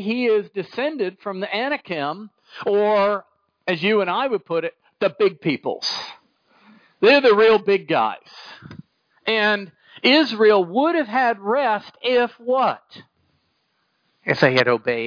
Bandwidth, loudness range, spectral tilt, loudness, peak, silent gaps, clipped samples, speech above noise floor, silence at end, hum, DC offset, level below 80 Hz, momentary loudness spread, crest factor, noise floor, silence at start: 5.4 kHz; 4 LU; -5.5 dB/octave; -20 LUFS; -2 dBFS; none; under 0.1%; 49 dB; 0 s; none; under 0.1%; -68 dBFS; 15 LU; 20 dB; -69 dBFS; 0 s